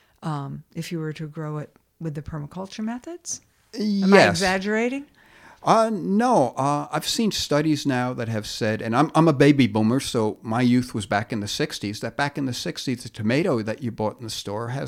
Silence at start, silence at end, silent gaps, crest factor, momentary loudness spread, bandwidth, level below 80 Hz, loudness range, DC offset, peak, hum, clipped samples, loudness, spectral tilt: 0.2 s; 0 s; none; 22 dB; 16 LU; 16 kHz; -56 dBFS; 7 LU; under 0.1%; -2 dBFS; none; under 0.1%; -23 LUFS; -5.5 dB/octave